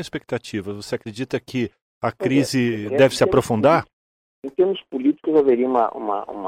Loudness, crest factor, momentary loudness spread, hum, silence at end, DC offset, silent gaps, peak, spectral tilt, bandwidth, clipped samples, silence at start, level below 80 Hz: -21 LUFS; 20 dB; 12 LU; none; 0 s; under 0.1%; 1.82-2.01 s, 3.93-4.42 s; -2 dBFS; -6 dB/octave; 16 kHz; under 0.1%; 0 s; -52 dBFS